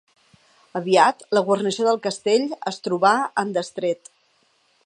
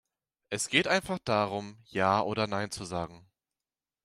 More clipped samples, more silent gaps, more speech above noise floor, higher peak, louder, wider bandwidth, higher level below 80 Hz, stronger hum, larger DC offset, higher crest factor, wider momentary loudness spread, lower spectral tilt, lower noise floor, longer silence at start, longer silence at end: neither; neither; second, 43 dB vs over 60 dB; first, -2 dBFS vs -8 dBFS; first, -21 LUFS vs -30 LUFS; second, 11 kHz vs 15 kHz; second, -76 dBFS vs -64 dBFS; neither; neither; about the same, 20 dB vs 24 dB; about the same, 11 LU vs 12 LU; about the same, -4 dB/octave vs -4 dB/octave; second, -63 dBFS vs under -90 dBFS; first, 0.75 s vs 0.5 s; about the same, 0.9 s vs 0.85 s